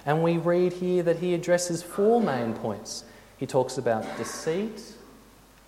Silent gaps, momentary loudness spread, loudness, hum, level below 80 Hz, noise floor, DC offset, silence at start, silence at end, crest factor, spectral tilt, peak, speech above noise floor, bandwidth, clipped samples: none; 13 LU; -26 LUFS; none; -60 dBFS; -53 dBFS; under 0.1%; 0.05 s; 0.55 s; 18 dB; -5.5 dB/octave; -8 dBFS; 28 dB; 16 kHz; under 0.1%